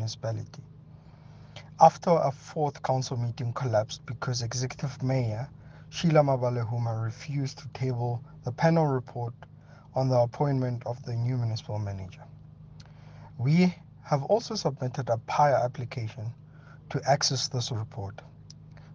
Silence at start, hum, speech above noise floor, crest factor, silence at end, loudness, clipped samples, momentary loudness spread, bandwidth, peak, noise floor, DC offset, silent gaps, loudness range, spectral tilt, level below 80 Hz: 0 s; none; 23 dB; 24 dB; 0 s; -28 LUFS; under 0.1%; 21 LU; 7.6 kHz; -4 dBFS; -50 dBFS; under 0.1%; none; 4 LU; -6 dB/octave; -60 dBFS